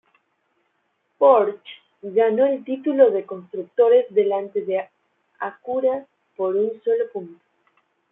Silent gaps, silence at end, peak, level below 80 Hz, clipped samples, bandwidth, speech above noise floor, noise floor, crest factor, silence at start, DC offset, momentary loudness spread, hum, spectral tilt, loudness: none; 0.8 s; -2 dBFS; -78 dBFS; under 0.1%; 3.8 kHz; 51 dB; -71 dBFS; 20 dB; 1.2 s; under 0.1%; 16 LU; none; -9.5 dB/octave; -21 LUFS